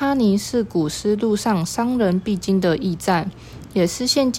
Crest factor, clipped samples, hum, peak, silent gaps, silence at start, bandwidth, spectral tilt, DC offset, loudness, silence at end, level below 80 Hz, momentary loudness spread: 16 dB; under 0.1%; none; -4 dBFS; none; 0 s; 16.5 kHz; -5 dB/octave; under 0.1%; -20 LUFS; 0 s; -48 dBFS; 4 LU